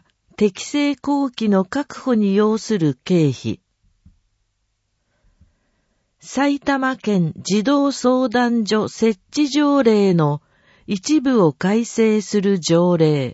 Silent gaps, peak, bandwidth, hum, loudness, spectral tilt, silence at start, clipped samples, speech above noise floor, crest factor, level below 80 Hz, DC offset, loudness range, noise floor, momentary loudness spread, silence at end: none; -2 dBFS; 8 kHz; none; -18 LUFS; -6 dB/octave; 0.4 s; under 0.1%; 53 dB; 16 dB; -60 dBFS; under 0.1%; 8 LU; -70 dBFS; 6 LU; 0 s